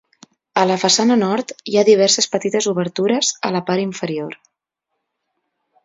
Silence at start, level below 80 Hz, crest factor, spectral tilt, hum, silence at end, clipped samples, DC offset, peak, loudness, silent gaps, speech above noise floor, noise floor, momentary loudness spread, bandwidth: 0.55 s; -66 dBFS; 18 dB; -3.5 dB/octave; none; 1.5 s; under 0.1%; under 0.1%; 0 dBFS; -17 LUFS; none; 61 dB; -78 dBFS; 11 LU; 7.8 kHz